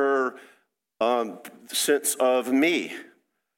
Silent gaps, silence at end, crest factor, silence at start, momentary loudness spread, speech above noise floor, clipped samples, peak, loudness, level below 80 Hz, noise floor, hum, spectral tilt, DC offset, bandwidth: none; 0.55 s; 16 dB; 0 s; 13 LU; 40 dB; under 0.1%; -10 dBFS; -24 LUFS; -82 dBFS; -64 dBFS; none; -2 dB/octave; under 0.1%; 17 kHz